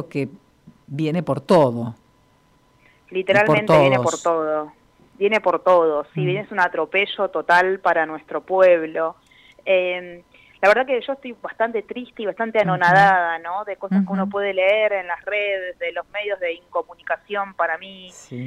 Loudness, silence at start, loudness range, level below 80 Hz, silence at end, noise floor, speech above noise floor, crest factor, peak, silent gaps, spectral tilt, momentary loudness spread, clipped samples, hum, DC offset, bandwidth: -20 LUFS; 0 s; 4 LU; -60 dBFS; 0 s; -58 dBFS; 38 dB; 16 dB; -4 dBFS; none; -5.5 dB/octave; 14 LU; under 0.1%; none; under 0.1%; 12 kHz